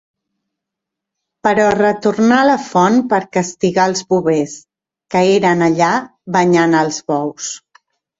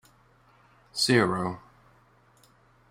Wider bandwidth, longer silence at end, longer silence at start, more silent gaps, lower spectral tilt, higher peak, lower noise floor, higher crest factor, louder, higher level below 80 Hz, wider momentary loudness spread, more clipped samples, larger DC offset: second, 8 kHz vs 16 kHz; second, 0.65 s vs 1.3 s; first, 1.45 s vs 0.95 s; neither; about the same, -5 dB/octave vs -4 dB/octave; first, 0 dBFS vs -8 dBFS; first, -81 dBFS vs -61 dBFS; second, 14 dB vs 24 dB; first, -14 LUFS vs -26 LUFS; first, -56 dBFS vs -64 dBFS; second, 8 LU vs 16 LU; neither; neither